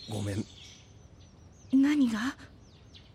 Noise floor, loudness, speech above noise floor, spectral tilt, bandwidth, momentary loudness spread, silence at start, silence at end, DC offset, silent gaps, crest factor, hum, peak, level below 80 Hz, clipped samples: -54 dBFS; -29 LUFS; 26 dB; -5.5 dB/octave; 13 kHz; 24 LU; 0 s; 0.15 s; under 0.1%; none; 16 dB; none; -16 dBFS; -60 dBFS; under 0.1%